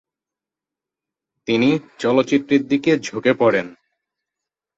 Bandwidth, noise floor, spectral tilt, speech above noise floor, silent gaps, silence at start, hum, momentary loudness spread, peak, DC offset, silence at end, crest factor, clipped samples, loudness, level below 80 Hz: 7.8 kHz; -88 dBFS; -5.5 dB/octave; 70 dB; none; 1.5 s; none; 6 LU; -4 dBFS; under 0.1%; 1.05 s; 18 dB; under 0.1%; -18 LUFS; -64 dBFS